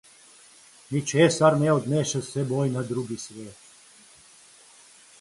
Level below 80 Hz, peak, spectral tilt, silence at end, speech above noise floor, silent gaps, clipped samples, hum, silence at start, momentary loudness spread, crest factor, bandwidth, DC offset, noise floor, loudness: -66 dBFS; -4 dBFS; -5.5 dB/octave; 1.65 s; 29 dB; none; under 0.1%; none; 0.9 s; 17 LU; 22 dB; 11.5 kHz; under 0.1%; -53 dBFS; -24 LUFS